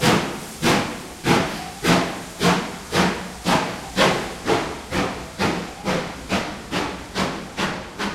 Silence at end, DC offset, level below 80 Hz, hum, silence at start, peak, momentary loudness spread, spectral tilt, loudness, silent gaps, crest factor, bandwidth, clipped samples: 0 s; under 0.1%; -44 dBFS; none; 0 s; -2 dBFS; 8 LU; -4 dB/octave; -23 LUFS; none; 20 dB; 16 kHz; under 0.1%